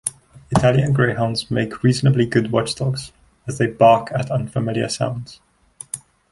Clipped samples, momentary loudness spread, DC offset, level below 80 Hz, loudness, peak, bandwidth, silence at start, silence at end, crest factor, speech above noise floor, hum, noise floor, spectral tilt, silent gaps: under 0.1%; 17 LU; under 0.1%; -46 dBFS; -19 LUFS; 0 dBFS; 11.5 kHz; 0.05 s; 0.35 s; 18 dB; 20 dB; none; -38 dBFS; -6 dB/octave; none